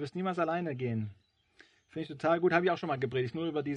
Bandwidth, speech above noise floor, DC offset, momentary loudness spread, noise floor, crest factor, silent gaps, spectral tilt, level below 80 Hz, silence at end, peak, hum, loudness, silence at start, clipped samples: 9.2 kHz; 32 dB; under 0.1%; 14 LU; -64 dBFS; 22 dB; none; -7.5 dB/octave; -74 dBFS; 0 s; -10 dBFS; none; -32 LUFS; 0 s; under 0.1%